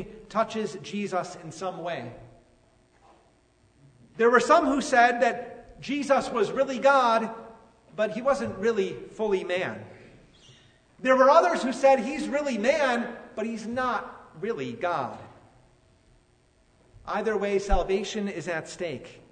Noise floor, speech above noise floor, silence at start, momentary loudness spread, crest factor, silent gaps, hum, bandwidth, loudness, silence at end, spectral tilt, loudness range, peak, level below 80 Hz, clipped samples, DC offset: -63 dBFS; 38 dB; 0 s; 16 LU; 22 dB; none; none; 9.6 kHz; -26 LUFS; 0.2 s; -4.5 dB/octave; 10 LU; -6 dBFS; -44 dBFS; under 0.1%; under 0.1%